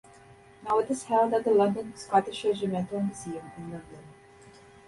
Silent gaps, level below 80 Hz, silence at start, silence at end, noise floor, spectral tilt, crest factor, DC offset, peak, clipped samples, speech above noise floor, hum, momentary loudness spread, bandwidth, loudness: none; -64 dBFS; 0.3 s; 0.4 s; -54 dBFS; -6 dB/octave; 18 dB; under 0.1%; -10 dBFS; under 0.1%; 26 dB; none; 17 LU; 11.5 kHz; -27 LUFS